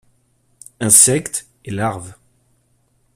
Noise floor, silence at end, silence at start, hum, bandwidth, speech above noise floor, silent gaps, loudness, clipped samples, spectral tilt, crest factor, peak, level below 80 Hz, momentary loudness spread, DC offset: -61 dBFS; 1.05 s; 0.8 s; none; 16 kHz; 45 dB; none; -14 LUFS; under 0.1%; -3 dB/octave; 20 dB; 0 dBFS; -54 dBFS; 19 LU; under 0.1%